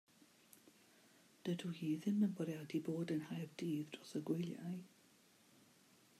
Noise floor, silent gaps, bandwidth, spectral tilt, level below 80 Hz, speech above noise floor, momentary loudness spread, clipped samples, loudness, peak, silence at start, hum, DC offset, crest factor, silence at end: -70 dBFS; none; 15 kHz; -7 dB/octave; under -90 dBFS; 28 dB; 24 LU; under 0.1%; -43 LUFS; -28 dBFS; 0.65 s; none; under 0.1%; 18 dB; 1.35 s